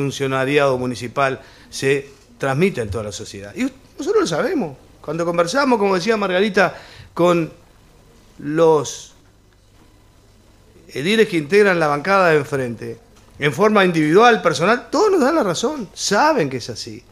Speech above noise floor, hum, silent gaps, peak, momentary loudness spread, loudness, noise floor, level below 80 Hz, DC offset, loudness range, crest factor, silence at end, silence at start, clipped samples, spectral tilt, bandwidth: 34 dB; none; none; -2 dBFS; 15 LU; -18 LUFS; -51 dBFS; -52 dBFS; under 0.1%; 6 LU; 18 dB; 0.1 s; 0 s; under 0.1%; -5 dB/octave; 15 kHz